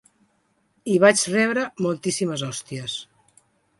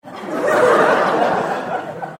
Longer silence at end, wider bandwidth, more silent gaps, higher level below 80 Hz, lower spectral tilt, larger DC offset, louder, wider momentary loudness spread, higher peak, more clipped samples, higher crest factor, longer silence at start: first, 0.75 s vs 0 s; second, 11.5 kHz vs 16.5 kHz; neither; second, -68 dBFS vs -60 dBFS; about the same, -4 dB/octave vs -5 dB/octave; neither; second, -22 LUFS vs -16 LUFS; about the same, 14 LU vs 12 LU; about the same, -2 dBFS vs -2 dBFS; neither; first, 22 dB vs 16 dB; first, 0.85 s vs 0.05 s